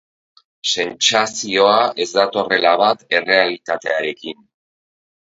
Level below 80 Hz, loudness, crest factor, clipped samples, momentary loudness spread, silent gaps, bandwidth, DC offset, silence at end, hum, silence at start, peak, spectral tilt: -66 dBFS; -16 LUFS; 18 dB; under 0.1%; 9 LU; none; 8 kHz; under 0.1%; 1 s; none; 0.65 s; 0 dBFS; -1.5 dB/octave